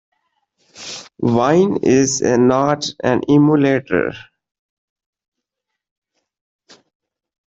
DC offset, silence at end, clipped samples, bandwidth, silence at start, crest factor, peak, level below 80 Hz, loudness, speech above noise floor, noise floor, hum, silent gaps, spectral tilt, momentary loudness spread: under 0.1%; 3.35 s; under 0.1%; 8 kHz; 0.8 s; 16 dB; -2 dBFS; -54 dBFS; -15 LUFS; 66 dB; -80 dBFS; none; none; -5.5 dB/octave; 17 LU